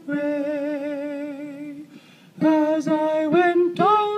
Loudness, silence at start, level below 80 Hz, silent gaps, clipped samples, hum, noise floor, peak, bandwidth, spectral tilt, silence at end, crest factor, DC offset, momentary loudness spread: -21 LUFS; 0.05 s; -80 dBFS; none; under 0.1%; none; -48 dBFS; -8 dBFS; 9.2 kHz; -6.5 dB/octave; 0 s; 14 dB; under 0.1%; 16 LU